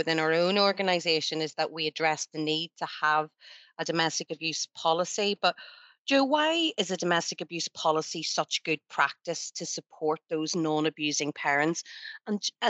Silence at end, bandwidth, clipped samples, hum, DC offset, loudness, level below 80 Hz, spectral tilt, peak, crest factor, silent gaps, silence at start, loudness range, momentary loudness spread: 0 s; 8.2 kHz; under 0.1%; none; under 0.1%; -28 LUFS; under -90 dBFS; -3 dB/octave; -10 dBFS; 18 dB; 5.99-6.05 s; 0 s; 2 LU; 10 LU